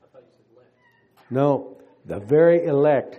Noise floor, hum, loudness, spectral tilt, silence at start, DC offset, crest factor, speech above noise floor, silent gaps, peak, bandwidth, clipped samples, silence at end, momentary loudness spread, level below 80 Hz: -61 dBFS; none; -19 LUFS; -9.5 dB/octave; 1.3 s; under 0.1%; 16 dB; 42 dB; none; -4 dBFS; 4.2 kHz; under 0.1%; 0.05 s; 15 LU; -64 dBFS